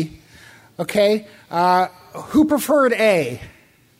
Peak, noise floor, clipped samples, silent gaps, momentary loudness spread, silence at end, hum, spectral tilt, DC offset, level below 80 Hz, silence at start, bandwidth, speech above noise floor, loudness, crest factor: -4 dBFS; -46 dBFS; under 0.1%; none; 14 LU; 0.5 s; none; -5 dB/octave; under 0.1%; -54 dBFS; 0 s; 16 kHz; 28 dB; -18 LUFS; 16 dB